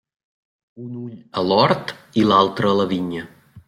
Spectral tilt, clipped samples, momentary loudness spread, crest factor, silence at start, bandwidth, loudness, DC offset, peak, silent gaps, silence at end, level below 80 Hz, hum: -6.5 dB/octave; under 0.1%; 17 LU; 20 dB; 0.75 s; 13.5 kHz; -19 LUFS; under 0.1%; -2 dBFS; none; 0.1 s; -58 dBFS; none